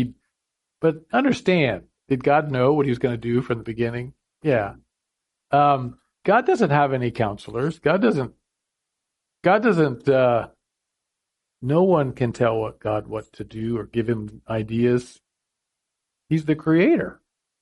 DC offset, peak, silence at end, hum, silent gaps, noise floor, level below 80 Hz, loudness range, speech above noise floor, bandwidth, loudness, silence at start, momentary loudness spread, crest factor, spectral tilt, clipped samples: under 0.1%; -4 dBFS; 0.5 s; none; none; -82 dBFS; -54 dBFS; 4 LU; 61 dB; 11 kHz; -22 LUFS; 0 s; 11 LU; 18 dB; -7.5 dB/octave; under 0.1%